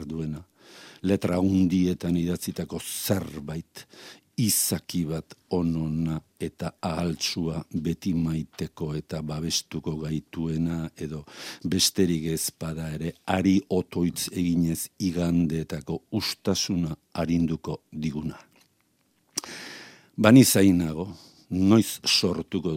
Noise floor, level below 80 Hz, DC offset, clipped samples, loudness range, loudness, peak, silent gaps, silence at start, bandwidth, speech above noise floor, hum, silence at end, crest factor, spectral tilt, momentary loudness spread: -68 dBFS; -54 dBFS; under 0.1%; under 0.1%; 7 LU; -26 LUFS; -2 dBFS; none; 0 s; 16.5 kHz; 43 dB; none; 0 s; 24 dB; -5 dB/octave; 14 LU